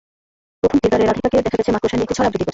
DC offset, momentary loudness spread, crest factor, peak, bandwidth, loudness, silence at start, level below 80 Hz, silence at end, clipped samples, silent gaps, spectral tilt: under 0.1%; 4 LU; 14 dB; -4 dBFS; 8 kHz; -17 LUFS; 0.65 s; -40 dBFS; 0 s; under 0.1%; none; -6 dB/octave